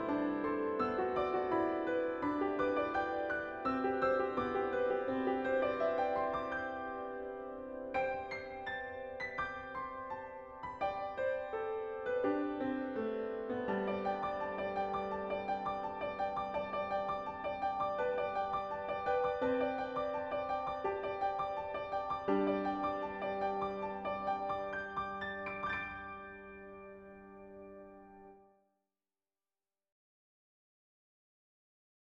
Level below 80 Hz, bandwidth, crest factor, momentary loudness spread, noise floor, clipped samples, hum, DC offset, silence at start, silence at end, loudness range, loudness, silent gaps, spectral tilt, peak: -66 dBFS; 7.4 kHz; 16 dB; 11 LU; under -90 dBFS; under 0.1%; none; under 0.1%; 0 s; 3.75 s; 7 LU; -37 LUFS; none; -7 dB/octave; -22 dBFS